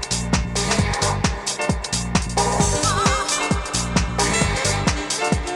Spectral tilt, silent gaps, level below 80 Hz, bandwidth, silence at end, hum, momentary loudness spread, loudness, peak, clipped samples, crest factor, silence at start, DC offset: -3.5 dB/octave; none; -30 dBFS; 16 kHz; 0 s; none; 4 LU; -20 LUFS; 0 dBFS; under 0.1%; 20 dB; 0 s; under 0.1%